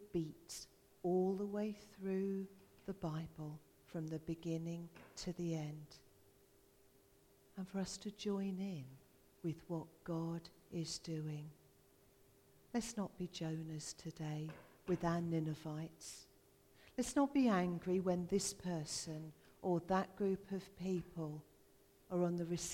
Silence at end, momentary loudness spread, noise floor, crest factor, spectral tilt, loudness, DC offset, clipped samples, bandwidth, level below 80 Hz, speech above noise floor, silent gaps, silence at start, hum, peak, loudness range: 0 s; 14 LU; -70 dBFS; 20 dB; -5.5 dB/octave; -43 LUFS; under 0.1%; under 0.1%; 17 kHz; -70 dBFS; 28 dB; none; 0 s; none; -24 dBFS; 8 LU